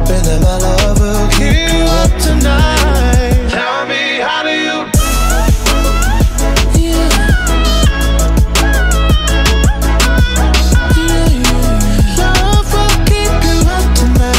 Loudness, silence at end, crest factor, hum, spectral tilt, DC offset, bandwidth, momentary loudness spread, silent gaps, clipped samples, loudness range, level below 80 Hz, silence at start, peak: -12 LUFS; 0 s; 10 dB; none; -4.5 dB/octave; under 0.1%; 16.5 kHz; 2 LU; none; under 0.1%; 1 LU; -12 dBFS; 0 s; 0 dBFS